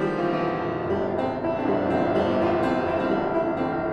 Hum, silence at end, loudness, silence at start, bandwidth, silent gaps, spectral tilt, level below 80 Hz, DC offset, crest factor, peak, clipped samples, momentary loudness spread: none; 0 s; -24 LUFS; 0 s; 8.8 kHz; none; -8 dB/octave; -52 dBFS; under 0.1%; 12 dB; -12 dBFS; under 0.1%; 4 LU